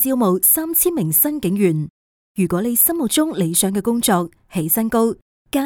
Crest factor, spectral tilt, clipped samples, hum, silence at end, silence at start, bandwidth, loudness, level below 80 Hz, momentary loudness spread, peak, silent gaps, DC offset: 16 dB; -4.5 dB/octave; under 0.1%; none; 0 s; 0 s; over 20 kHz; -17 LUFS; -50 dBFS; 11 LU; -2 dBFS; 1.90-2.35 s, 5.22-5.45 s; under 0.1%